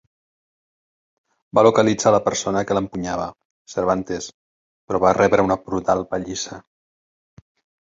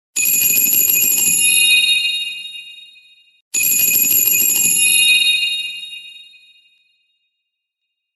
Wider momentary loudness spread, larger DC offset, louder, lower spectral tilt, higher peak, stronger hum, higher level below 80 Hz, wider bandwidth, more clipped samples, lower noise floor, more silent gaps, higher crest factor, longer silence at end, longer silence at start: second, 14 LU vs 17 LU; neither; second, -20 LUFS vs -11 LUFS; first, -5 dB/octave vs 2.5 dB/octave; about the same, -2 dBFS vs -2 dBFS; neither; first, -50 dBFS vs -62 dBFS; second, 7.8 kHz vs 14 kHz; neither; first, under -90 dBFS vs -77 dBFS; first, 3.45-3.65 s, 4.34-4.88 s vs 3.41-3.51 s; about the same, 20 dB vs 16 dB; second, 1.25 s vs 1.95 s; first, 1.55 s vs 0.15 s